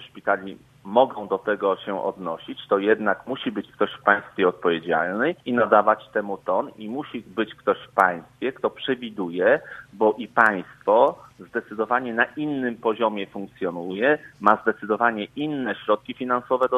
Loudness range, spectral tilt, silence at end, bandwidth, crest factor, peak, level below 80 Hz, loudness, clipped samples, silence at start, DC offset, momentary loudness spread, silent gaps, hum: 3 LU; -6.5 dB/octave; 0 s; 11.5 kHz; 24 dB; 0 dBFS; -66 dBFS; -23 LUFS; under 0.1%; 0 s; under 0.1%; 12 LU; none; none